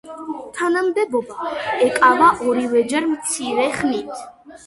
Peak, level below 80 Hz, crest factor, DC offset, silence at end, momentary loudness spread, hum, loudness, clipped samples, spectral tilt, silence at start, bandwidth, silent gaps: 0 dBFS; -58 dBFS; 18 dB; under 0.1%; 0.1 s; 15 LU; none; -18 LUFS; under 0.1%; -3 dB/octave; 0.05 s; 11.5 kHz; none